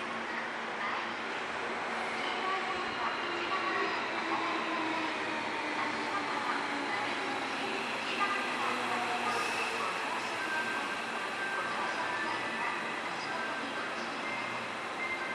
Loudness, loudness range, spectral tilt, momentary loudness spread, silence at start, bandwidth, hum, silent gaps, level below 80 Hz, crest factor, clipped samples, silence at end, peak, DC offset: -33 LUFS; 2 LU; -2.5 dB/octave; 4 LU; 0 s; 14 kHz; none; none; -74 dBFS; 16 dB; under 0.1%; 0 s; -18 dBFS; under 0.1%